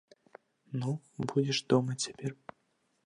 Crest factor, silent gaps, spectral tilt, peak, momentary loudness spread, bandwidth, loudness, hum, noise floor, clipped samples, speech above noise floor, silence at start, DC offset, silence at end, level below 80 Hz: 22 dB; none; -5 dB/octave; -12 dBFS; 13 LU; 11 kHz; -33 LUFS; none; -76 dBFS; under 0.1%; 44 dB; 0.7 s; under 0.1%; 0.7 s; -74 dBFS